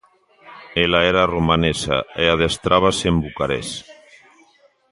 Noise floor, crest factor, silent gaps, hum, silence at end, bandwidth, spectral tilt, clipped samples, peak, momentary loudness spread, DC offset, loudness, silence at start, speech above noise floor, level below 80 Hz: -56 dBFS; 20 dB; none; none; 1 s; 11.5 kHz; -4.5 dB/octave; under 0.1%; 0 dBFS; 9 LU; under 0.1%; -18 LUFS; 0.45 s; 38 dB; -38 dBFS